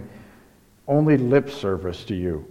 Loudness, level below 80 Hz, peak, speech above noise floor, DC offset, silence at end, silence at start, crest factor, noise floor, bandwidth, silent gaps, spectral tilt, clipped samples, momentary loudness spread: -22 LUFS; -48 dBFS; -6 dBFS; 33 dB; under 0.1%; 0 s; 0 s; 18 dB; -54 dBFS; 12.5 kHz; none; -8.5 dB/octave; under 0.1%; 14 LU